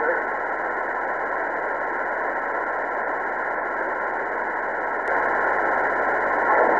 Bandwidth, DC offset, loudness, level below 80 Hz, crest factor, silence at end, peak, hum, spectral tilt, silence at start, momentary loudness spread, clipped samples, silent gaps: 9.8 kHz; 0.1%; -24 LUFS; -56 dBFS; 18 dB; 0 s; -6 dBFS; none; -5.5 dB/octave; 0 s; 4 LU; under 0.1%; none